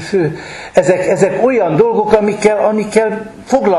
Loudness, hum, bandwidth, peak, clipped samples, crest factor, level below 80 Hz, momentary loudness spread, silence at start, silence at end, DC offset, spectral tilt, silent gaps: -13 LUFS; none; 12 kHz; 0 dBFS; 0.3%; 12 dB; -46 dBFS; 7 LU; 0 s; 0 s; under 0.1%; -6 dB/octave; none